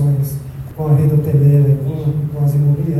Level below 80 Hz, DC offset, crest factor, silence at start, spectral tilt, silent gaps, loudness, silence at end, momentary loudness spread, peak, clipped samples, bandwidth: -40 dBFS; under 0.1%; 12 dB; 0 s; -10 dB/octave; none; -15 LUFS; 0 s; 11 LU; -2 dBFS; under 0.1%; 13.5 kHz